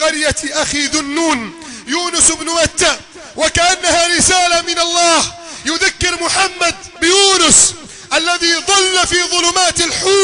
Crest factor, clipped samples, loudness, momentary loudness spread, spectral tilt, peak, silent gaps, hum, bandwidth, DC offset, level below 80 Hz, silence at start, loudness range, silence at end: 14 dB; under 0.1%; -12 LUFS; 10 LU; -1 dB/octave; 0 dBFS; none; none; 13 kHz; under 0.1%; -38 dBFS; 0 s; 3 LU; 0 s